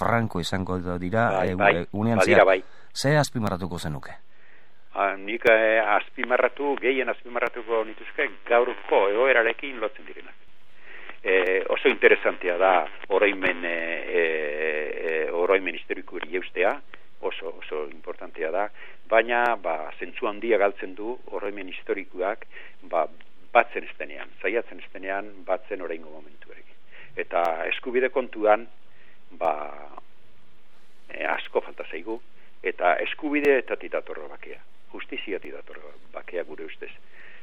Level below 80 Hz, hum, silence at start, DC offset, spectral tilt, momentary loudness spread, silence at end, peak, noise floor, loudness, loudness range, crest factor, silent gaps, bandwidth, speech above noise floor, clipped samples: -60 dBFS; none; 0 s; 2%; -5.5 dB/octave; 17 LU; 0.15 s; -2 dBFS; -61 dBFS; -25 LUFS; 9 LU; 24 dB; none; 14 kHz; 36 dB; under 0.1%